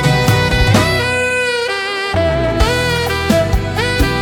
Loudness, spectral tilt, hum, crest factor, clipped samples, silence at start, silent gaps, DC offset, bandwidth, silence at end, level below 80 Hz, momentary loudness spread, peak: -14 LUFS; -5 dB/octave; none; 14 dB; under 0.1%; 0 s; none; under 0.1%; 17.5 kHz; 0 s; -24 dBFS; 5 LU; 0 dBFS